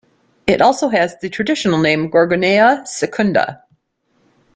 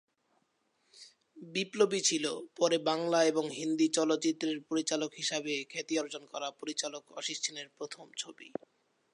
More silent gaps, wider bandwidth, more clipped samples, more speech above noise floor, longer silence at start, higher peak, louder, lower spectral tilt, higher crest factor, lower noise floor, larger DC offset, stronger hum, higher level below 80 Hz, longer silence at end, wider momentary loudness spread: neither; second, 9.4 kHz vs 11.5 kHz; neither; first, 48 dB vs 43 dB; second, 0.45 s vs 0.95 s; first, 0 dBFS vs -14 dBFS; first, -15 LUFS vs -33 LUFS; first, -5 dB/octave vs -2.5 dB/octave; about the same, 16 dB vs 20 dB; second, -63 dBFS vs -76 dBFS; neither; neither; first, -52 dBFS vs -86 dBFS; first, 1 s vs 0.65 s; second, 9 LU vs 13 LU